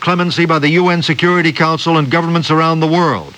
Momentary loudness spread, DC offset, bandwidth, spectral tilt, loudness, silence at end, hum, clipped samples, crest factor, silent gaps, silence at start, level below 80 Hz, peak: 2 LU; under 0.1%; 9.4 kHz; -6 dB/octave; -12 LUFS; 0.05 s; none; under 0.1%; 12 dB; none; 0 s; -54 dBFS; 0 dBFS